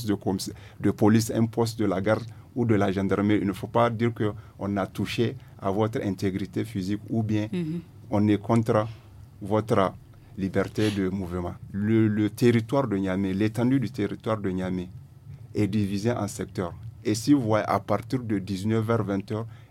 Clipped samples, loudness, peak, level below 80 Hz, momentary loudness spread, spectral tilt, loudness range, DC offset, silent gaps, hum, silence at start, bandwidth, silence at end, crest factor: under 0.1%; -26 LUFS; -6 dBFS; -54 dBFS; 11 LU; -7 dB/octave; 4 LU; under 0.1%; none; none; 0 s; 16 kHz; 0.05 s; 18 dB